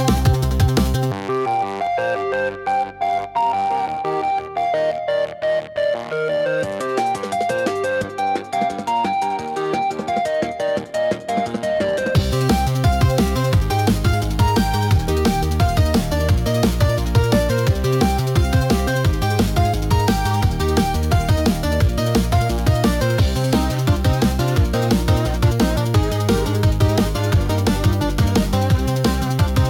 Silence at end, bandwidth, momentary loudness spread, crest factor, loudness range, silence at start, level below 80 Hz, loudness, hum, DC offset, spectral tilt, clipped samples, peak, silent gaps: 0 s; 18 kHz; 4 LU; 12 dB; 3 LU; 0 s; -26 dBFS; -19 LUFS; none; under 0.1%; -6 dB/octave; under 0.1%; -6 dBFS; none